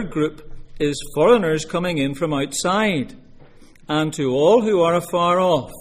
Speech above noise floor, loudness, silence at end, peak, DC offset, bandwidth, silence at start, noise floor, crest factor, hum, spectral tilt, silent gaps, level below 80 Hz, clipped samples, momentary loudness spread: 26 dB; -19 LUFS; 0 s; -2 dBFS; under 0.1%; 15.5 kHz; 0 s; -44 dBFS; 18 dB; none; -5 dB/octave; none; -44 dBFS; under 0.1%; 9 LU